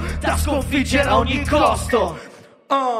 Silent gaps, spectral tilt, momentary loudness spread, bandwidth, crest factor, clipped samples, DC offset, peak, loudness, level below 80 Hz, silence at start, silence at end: none; -5 dB/octave; 6 LU; 15.5 kHz; 16 dB; under 0.1%; under 0.1%; -2 dBFS; -19 LUFS; -28 dBFS; 0 s; 0 s